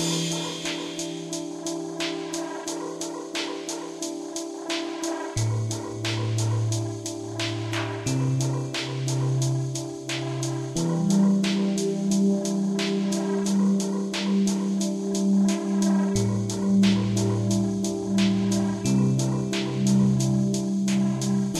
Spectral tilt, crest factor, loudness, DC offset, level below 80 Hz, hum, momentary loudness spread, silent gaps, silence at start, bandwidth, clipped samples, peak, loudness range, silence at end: -5.5 dB/octave; 16 dB; -25 LUFS; under 0.1%; -56 dBFS; none; 10 LU; none; 0 s; 13.5 kHz; under 0.1%; -10 dBFS; 7 LU; 0 s